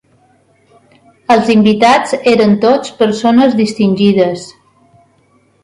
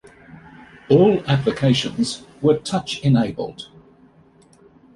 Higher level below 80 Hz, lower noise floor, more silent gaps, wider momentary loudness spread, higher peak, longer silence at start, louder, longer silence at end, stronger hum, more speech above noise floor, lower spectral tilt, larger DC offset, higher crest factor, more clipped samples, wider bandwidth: about the same, -54 dBFS vs -52 dBFS; about the same, -52 dBFS vs -52 dBFS; neither; second, 6 LU vs 15 LU; about the same, 0 dBFS vs -2 dBFS; first, 1.3 s vs 0.35 s; first, -10 LUFS vs -19 LUFS; second, 1.15 s vs 1.3 s; neither; first, 43 dB vs 34 dB; about the same, -6 dB/octave vs -6.5 dB/octave; neither; second, 12 dB vs 18 dB; neither; about the same, 11 kHz vs 11.5 kHz